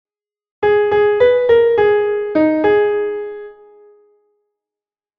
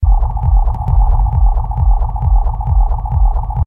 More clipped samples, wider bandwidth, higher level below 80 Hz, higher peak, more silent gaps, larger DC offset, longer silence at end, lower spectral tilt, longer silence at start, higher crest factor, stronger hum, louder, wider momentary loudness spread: neither; first, 5 kHz vs 1.5 kHz; second, -50 dBFS vs -12 dBFS; about the same, -2 dBFS vs -2 dBFS; neither; neither; first, 1.65 s vs 0 s; second, -7.5 dB/octave vs -11.5 dB/octave; first, 0.6 s vs 0 s; about the same, 14 dB vs 10 dB; neither; about the same, -14 LUFS vs -16 LUFS; first, 11 LU vs 2 LU